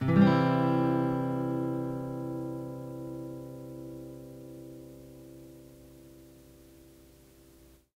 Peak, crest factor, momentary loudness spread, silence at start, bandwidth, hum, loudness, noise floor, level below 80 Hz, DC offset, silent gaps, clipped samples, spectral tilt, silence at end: -10 dBFS; 22 dB; 25 LU; 0 s; 16 kHz; none; -30 LUFS; -58 dBFS; -62 dBFS; under 0.1%; none; under 0.1%; -8.5 dB/octave; 1.65 s